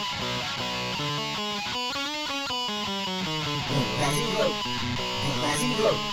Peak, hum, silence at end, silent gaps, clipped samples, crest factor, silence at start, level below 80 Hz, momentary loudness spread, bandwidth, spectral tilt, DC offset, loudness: -12 dBFS; none; 0 s; none; under 0.1%; 16 dB; 0 s; -50 dBFS; 4 LU; 19.5 kHz; -3.5 dB/octave; under 0.1%; -27 LUFS